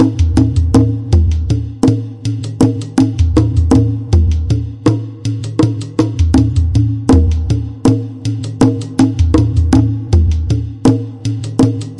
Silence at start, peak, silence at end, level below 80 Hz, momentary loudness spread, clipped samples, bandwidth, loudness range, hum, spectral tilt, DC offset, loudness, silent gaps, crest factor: 0 s; 0 dBFS; 0 s; -22 dBFS; 7 LU; under 0.1%; 11.5 kHz; 1 LU; none; -8 dB/octave; under 0.1%; -14 LUFS; none; 12 dB